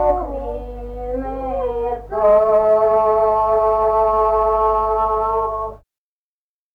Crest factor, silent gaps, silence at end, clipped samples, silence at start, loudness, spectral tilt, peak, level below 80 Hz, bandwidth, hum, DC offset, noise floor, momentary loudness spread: 12 dB; none; 0.95 s; under 0.1%; 0 s; -17 LUFS; -8.5 dB/octave; -6 dBFS; -36 dBFS; 5 kHz; none; under 0.1%; under -90 dBFS; 13 LU